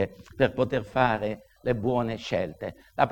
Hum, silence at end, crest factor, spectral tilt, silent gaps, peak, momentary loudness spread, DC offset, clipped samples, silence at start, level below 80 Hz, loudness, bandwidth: none; 0 s; 22 dB; -7 dB/octave; none; -4 dBFS; 9 LU; under 0.1%; under 0.1%; 0 s; -52 dBFS; -28 LUFS; 17.5 kHz